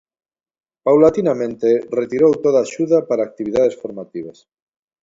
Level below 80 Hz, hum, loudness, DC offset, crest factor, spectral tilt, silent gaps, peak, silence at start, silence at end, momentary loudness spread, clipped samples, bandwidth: -56 dBFS; none; -17 LUFS; under 0.1%; 18 dB; -7 dB/octave; none; 0 dBFS; 0.85 s; 0.7 s; 17 LU; under 0.1%; 7.8 kHz